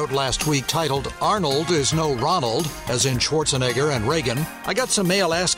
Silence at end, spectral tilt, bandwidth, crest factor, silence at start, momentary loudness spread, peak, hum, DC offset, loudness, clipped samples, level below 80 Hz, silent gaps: 0 s; -3.5 dB/octave; 16 kHz; 12 dB; 0 s; 5 LU; -8 dBFS; none; under 0.1%; -21 LUFS; under 0.1%; -42 dBFS; none